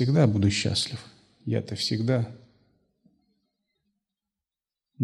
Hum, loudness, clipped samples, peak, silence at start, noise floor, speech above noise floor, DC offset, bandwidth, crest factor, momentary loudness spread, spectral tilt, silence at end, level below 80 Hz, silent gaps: none; -26 LUFS; under 0.1%; -8 dBFS; 0 s; under -90 dBFS; over 65 dB; under 0.1%; 12.5 kHz; 20 dB; 14 LU; -5.5 dB/octave; 0 s; -60 dBFS; none